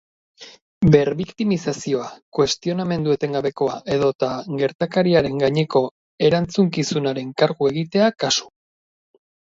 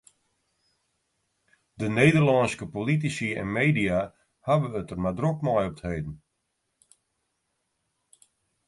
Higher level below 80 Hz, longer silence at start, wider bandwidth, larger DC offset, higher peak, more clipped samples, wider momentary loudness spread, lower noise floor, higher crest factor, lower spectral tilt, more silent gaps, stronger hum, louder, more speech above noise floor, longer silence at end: about the same, -50 dBFS vs -52 dBFS; second, 0.4 s vs 1.8 s; second, 7.8 kHz vs 11.5 kHz; neither; first, 0 dBFS vs -6 dBFS; neither; second, 7 LU vs 13 LU; first, under -90 dBFS vs -78 dBFS; about the same, 20 dB vs 22 dB; about the same, -5.5 dB/octave vs -6.5 dB/octave; first, 0.62-0.81 s, 2.22-2.32 s, 4.15-4.19 s, 4.75-4.79 s, 5.91-6.18 s vs none; neither; first, -20 LUFS vs -25 LUFS; first, over 71 dB vs 53 dB; second, 1 s vs 2.5 s